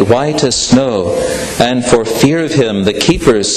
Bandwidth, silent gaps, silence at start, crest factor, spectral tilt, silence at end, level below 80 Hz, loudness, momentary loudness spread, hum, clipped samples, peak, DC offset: 14 kHz; none; 0 s; 12 dB; -4.5 dB/octave; 0 s; -34 dBFS; -12 LUFS; 4 LU; none; under 0.1%; 0 dBFS; under 0.1%